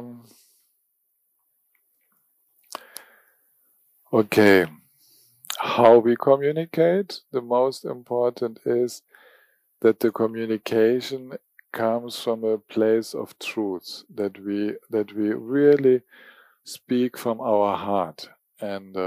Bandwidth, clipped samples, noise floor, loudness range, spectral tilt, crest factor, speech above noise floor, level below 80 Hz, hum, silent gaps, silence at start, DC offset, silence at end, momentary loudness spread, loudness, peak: 15.5 kHz; under 0.1%; -72 dBFS; 6 LU; -5.5 dB/octave; 20 dB; 50 dB; -74 dBFS; none; none; 0 s; under 0.1%; 0 s; 20 LU; -23 LUFS; -4 dBFS